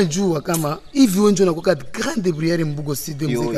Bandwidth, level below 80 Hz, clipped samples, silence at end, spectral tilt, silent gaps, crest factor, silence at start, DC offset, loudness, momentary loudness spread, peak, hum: 14 kHz; -48 dBFS; under 0.1%; 0 s; -5.5 dB/octave; none; 16 dB; 0 s; under 0.1%; -19 LUFS; 9 LU; -2 dBFS; none